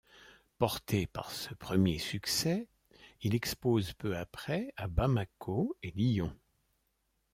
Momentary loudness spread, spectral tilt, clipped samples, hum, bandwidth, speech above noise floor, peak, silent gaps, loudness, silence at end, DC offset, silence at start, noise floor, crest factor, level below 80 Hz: 8 LU; -5.5 dB/octave; under 0.1%; none; 16.5 kHz; 46 dB; -14 dBFS; none; -34 LUFS; 1 s; under 0.1%; 0.15 s; -79 dBFS; 22 dB; -50 dBFS